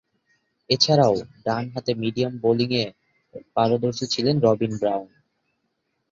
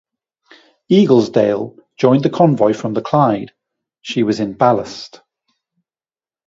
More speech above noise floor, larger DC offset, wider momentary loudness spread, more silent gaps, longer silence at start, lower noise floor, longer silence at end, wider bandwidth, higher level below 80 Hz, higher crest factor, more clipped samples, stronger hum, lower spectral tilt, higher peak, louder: second, 53 dB vs over 76 dB; neither; second, 9 LU vs 17 LU; neither; second, 0.7 s vs 0.9 s; second, -74 dBFS vs under -90 dBFS; second, 1.05 s vs 1.4 s; about the same, 7.6 kHz vs 7.8 kHz; about the same, -60 dBFS vs -58 dBFS; about the same, 20 dB vs 16 dB; neither; neither; second, -5.5 dB/octave vs -7.5 dB/octave; second, -4 dBFS vs 0 dBFS; second, -22 LUFS vs -15 LUFS